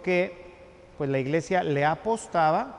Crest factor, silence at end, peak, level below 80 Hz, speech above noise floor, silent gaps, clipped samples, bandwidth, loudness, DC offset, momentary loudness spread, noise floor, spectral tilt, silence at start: 14 dB; 0 s; -12 dBFS; -58 dBFS; 24 dB; none; under 0.1%; 11.5 kHz; -26 LUFS; under 0.1%; 9 LU; -49 dBFS; -6 dB/octave; 0 s